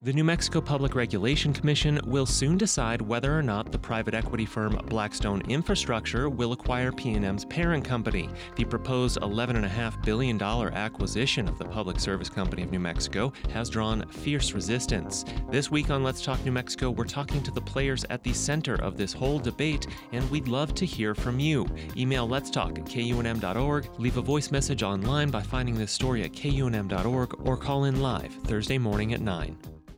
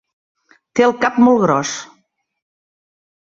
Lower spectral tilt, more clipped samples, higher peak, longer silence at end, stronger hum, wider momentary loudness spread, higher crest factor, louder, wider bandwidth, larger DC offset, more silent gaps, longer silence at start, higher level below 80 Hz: about the same, -5 dB/octave vs -5 dB/octave; neither; second, -14 dBFS vs -2 dBFS; second, 0 s vs 1.5 s; neither; second, 6 LU vs 12 LU; about the same, 14 dB vs 18 dB; second, -28 LUFS vs -15 LUFS; first, 16.5 kHz vs 7.8 kHz; neither; neither; second, 0 s vs 0.75 s; first, -38 dBFS vs -60 dBFS